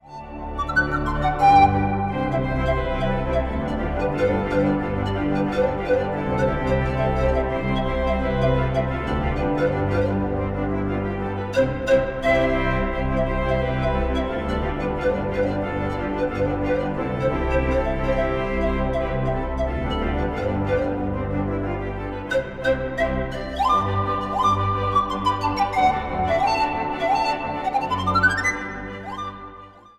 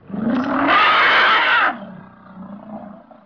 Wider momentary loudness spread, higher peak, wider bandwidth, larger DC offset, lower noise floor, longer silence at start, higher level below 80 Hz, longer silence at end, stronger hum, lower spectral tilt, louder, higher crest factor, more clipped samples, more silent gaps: second, 6 LU vs 23 LU; about the same, -4 dBFS vs -6 dBFS; first, 12 kHz vs 5.4 kHz; neither; first, -43 dBFS vs -39 dBFS; about the same, 0.05 s vs 0.1 s; first, -32 dBFS vs -56 dBFS; second, 0.2 s vs 0.35 s; neither; first, -7 dB/octave vs -5 dB/octave; second, -23 LUFS vs -14 LUFS; first, 18 dB vs 12 dB; neither; neither